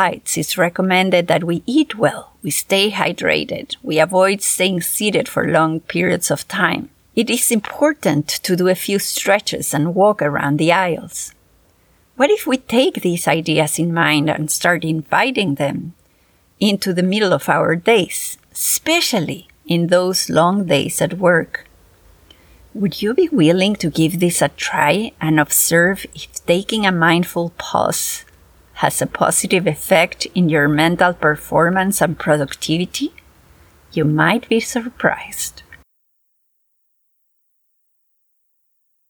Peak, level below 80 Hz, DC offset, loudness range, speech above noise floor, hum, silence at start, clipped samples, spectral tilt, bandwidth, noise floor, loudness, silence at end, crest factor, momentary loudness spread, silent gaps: 0 dBFS; -52 dBFS; under 0.1%; 3 LU; 49 dB; none; 0 s; under 0.1%; -4 dB/octave; over 20 kHz; -66 dBFS; -16 LUFS; 3.35 s; 16 dB; 8 LU; none